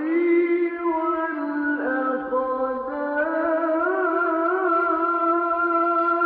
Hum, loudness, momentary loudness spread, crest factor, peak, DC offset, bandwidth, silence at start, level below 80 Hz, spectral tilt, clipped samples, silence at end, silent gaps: none; -22 LUFS; 5 LU; 10 dB; -12 dBFS; under 0.1%; 4.4 kHz; 0 s; -64 dBFS; -3 dB/octave; under 0.1%; 0 s; none